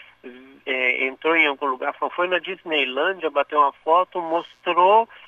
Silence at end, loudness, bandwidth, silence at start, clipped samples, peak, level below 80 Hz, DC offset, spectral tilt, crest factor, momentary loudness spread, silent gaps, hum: 0.1 s; -21 LUFS; 7.4 kHz; 0.25 s; under 0.1%; -6 dBFS; -74 dBFS; under 0.1%; -4.5 dB/octave; 16 dB; 8 LU; none; none